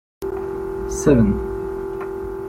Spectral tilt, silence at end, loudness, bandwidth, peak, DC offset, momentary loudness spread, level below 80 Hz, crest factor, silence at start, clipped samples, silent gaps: -7.5 dB/octave; 0 s; -22 LUFS; 16 kHz; -2 dBFS; under 0.1%; 12 LU; -34 dBFS; 18 dB; 0.2 s; under 0.1%; none